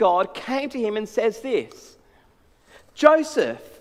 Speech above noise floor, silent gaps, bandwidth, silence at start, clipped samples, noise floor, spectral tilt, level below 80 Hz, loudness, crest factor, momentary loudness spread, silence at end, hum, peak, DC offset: 36 dB; none; 14 kHz; 0 s; under 0.1%; -58 dBFS; -4 dB/octave; -62 dBFS; -22 LUFS; 22 dB; 10 LU; 0.15 s; none; 0 dBFS; under 0.1%